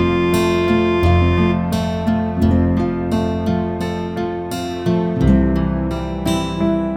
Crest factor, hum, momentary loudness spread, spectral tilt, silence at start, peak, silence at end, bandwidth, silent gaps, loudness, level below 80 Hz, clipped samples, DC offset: 14 dB; none; 8 LU; -7 dB/octave; 0 s; -2 dBFS; 0 s; 16.5 kHz; none; -18 LUFS; -28 dBFS; under 0.1%; under 0.1%